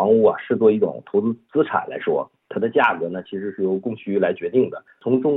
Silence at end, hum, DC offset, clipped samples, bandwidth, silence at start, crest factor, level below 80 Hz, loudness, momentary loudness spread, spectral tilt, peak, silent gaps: 0 s; none; under 0.1%; under 0.1%; 4 kHz; 0 s; 16 dB; -76 dBFS; -21 LUFS; 9 LU; -9.5 dB/octave; -4 dBFS; none